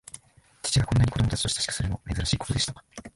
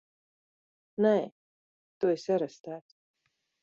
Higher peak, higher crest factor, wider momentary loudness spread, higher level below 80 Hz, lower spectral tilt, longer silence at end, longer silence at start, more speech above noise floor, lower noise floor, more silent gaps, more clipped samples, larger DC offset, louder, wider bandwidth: first, -10 dBFS vs -14 dBFS; about the same, 18 dB vs 20 dB; second, 14 LU vs 17 LU; first, -38 dBFS vs -80 dBFS; second, -4 dB/octave vs -7 dB/octave; second, 0.05 s vs 0.85 s; second, 0.15 s vs 1 s; second, 23 dB vs over 61 dB; second, -50 dBFS vs under -90 dBFS; second, none vs 1.32-2.01 s, 2.60-2.64 s; neither; neither; first, -26 LUFS vs -29 LUFS; first, 11.5 kHz vs 7.6 kHz